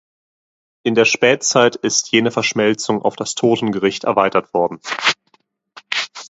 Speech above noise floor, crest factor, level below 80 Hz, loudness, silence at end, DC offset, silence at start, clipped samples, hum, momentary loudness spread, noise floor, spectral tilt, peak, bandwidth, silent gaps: 44 dB; 18 dB; -62 dBFS; -17 LUFS; 0 s; under 0.1%; 0.85 s; under 0.1%; none; 8 LU; -60 dBFS; -3 dB/octave; 0 dBFS; 8.2 kHz; none